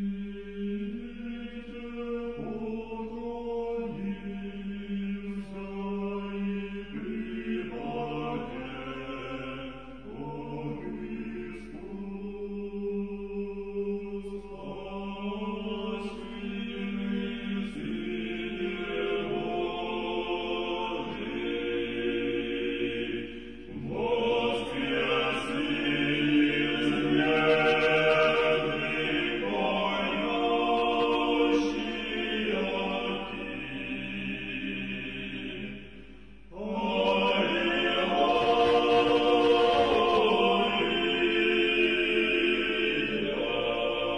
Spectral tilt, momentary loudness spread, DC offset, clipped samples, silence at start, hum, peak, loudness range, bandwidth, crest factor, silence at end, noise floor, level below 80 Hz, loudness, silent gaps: -6 dB/octave; 15 LU; 0.3%; under 0.1%; 0 s; none; -12 dBFS; 12 LU; 10 kHz; 18 dB; 0 s; -50 dBFS; -54 dBFS; -29 LUFS; none